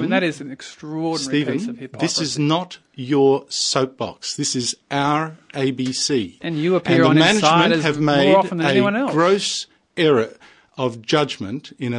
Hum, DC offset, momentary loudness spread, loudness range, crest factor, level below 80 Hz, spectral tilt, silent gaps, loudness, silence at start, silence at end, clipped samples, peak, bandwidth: none; under 0.1%; 14 LU; 6 LU; 18 dB; -62 dBFS; -4.5 dB/octave; none; -19 LUFS; 0 s; 0 s; under 0.1%; 0 dBFS; 11 kHz